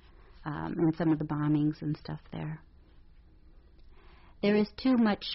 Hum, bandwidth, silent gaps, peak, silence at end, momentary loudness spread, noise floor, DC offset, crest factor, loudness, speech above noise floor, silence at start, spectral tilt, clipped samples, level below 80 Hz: none; 5.8 kHz; none; -16 dBFS; 0 s; 14 LU; -56 dBFS; under 0.1%; 14 dB; -30 LUFS; 27 dB; 0.35 s; -6 dB/octave; under 0.1%; -56 dBFS